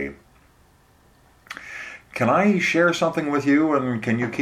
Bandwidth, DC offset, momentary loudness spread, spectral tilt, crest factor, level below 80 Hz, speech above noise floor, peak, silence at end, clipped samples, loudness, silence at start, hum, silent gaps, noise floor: 14 kHz; under 0.1%; 17 LU; -6 dB/octave; 16 dB; -58 dBFS; 36 dB; -6 dBFS; 0 s; under 0.1%; -20 LUFS; 0 s; none; none; -56 dBFS